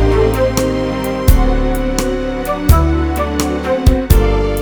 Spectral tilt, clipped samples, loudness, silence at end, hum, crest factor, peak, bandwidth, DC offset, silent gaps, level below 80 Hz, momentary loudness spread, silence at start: -6 dB/octave; 0.3%; -15 LUFS; 0 s; none; 12 dB; 0 dBFS; over 20 kHz; under 0.1%; none; -16 dBFS; 5 LU; 0 s